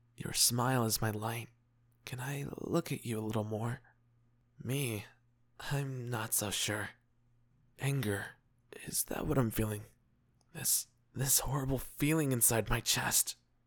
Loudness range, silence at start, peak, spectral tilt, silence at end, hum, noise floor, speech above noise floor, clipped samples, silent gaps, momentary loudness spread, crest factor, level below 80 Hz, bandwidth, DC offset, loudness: 8 LU; 0.2 s; -14 dBFS; -3.5 dB/octave; 0.35 s; none; -71 dBFS; 37 dB; under 0.1%; none; 16 LU; 20 dB; -52 dBFS; over 20 kHz; under 0.1%; -33 LUFS